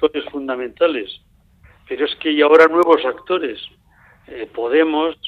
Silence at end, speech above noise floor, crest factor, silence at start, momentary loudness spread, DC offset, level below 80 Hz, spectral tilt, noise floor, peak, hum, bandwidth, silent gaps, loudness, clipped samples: 0 s; 34 dB; 18 dB; 0 s; 22 LU; under 0.1%; -56 dBFS; -5 dB/octave; -51 dBFS; 0 dBFS; none; 6.2 kHz; none; -17 LUFS; under 0.1%